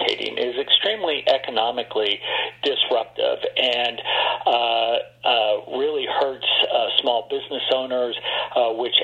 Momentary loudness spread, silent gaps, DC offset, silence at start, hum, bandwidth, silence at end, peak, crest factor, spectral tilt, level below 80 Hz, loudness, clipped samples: 6 LU; none; under 0.1%; 0 s; none; 8.8 kHz; 0 s; -2 dBFS; 20 dB; -3.5 dB/octave; -68 dBFS; -21 LUFS; under 0.1%